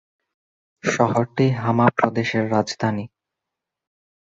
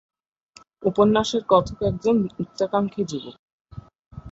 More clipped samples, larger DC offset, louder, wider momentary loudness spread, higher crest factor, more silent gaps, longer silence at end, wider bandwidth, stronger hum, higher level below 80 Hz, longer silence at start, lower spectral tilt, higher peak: neither; neither; about the same, -21 LUFS vs -22 LUFS; second, 8 LU vs 12 LU; about the same, 20 dB vs 20 dB; second, none vs 3.39-3.65 s, 3.99-4.11 s; first, 1.15 s vs 0 s; about the same, 8 kHz vs 8 kHz; neither; second, -58 dBFS vs -50 dBFS; about the same, 0.85 s vs 0.8 s; about the same, -6 dB/octave vs -6 dB/octave; about the same, -2 dBFS vs -4 dBFS